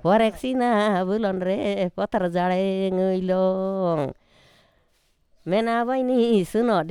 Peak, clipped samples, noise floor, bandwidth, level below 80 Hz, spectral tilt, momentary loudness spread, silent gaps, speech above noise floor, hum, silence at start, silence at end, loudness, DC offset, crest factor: -8 dBFS; under 0.1%; -65 dBFS; 13 kHz; -56 dBFS; -7 dB/octave; 5 LU; none; 43 dB; none; 0.05 s; 0 s; -23 LUFS; under 0.1%; 16 dB